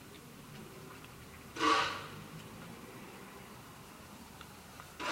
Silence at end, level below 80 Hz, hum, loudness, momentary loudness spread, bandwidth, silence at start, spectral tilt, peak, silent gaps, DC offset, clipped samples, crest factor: 0 s; -66 dBFS; none; -37 LUFS; 21 LU; 16 kHz; 0 s; -3 dB/octave; -16 dBFS; none; under 0.1%; under 0.1%; 24 dB